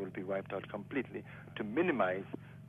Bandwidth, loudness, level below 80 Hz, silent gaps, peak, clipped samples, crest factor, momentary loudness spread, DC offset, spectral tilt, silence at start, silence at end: 3.9 kHz; -37 LUFS; -72 dBFS; none; -20 dBFS; under 0.1%; 18 dB; 14 LU; under 0.1%; -8 dB/octave; 0 s; 0 s